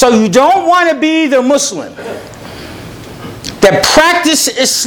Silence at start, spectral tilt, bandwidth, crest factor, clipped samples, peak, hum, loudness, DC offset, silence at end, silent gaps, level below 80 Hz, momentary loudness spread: 0 s; -2.5 dB/octave; over 20 kHz; 10 dB; 0.5%; 0 dBFS; none; -9 LUFS; under 0.1%; 0 s; none; -40 dBFS; 21 LU